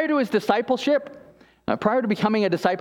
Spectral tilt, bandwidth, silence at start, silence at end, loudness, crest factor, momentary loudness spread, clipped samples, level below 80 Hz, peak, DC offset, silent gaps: -6 dB/octave; 16 kHz; 0 s; 0 s; -22 LUFS; 18 dB; 7 LU; under 0.1%; -62 dBFS; -4 dBFS; under 0.1%; none